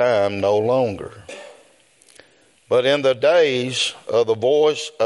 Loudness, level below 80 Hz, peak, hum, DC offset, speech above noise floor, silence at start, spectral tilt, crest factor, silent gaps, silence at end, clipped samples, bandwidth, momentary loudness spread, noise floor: -18 LUFS; -64 dBFS; -6 dBFS; none; under 0.1%; 36 dB; 0 s; -4 dB/octave; 14 dB; none; 0 s; under 0.1%; 11.5 kHz; 18 LU; -55 dBFS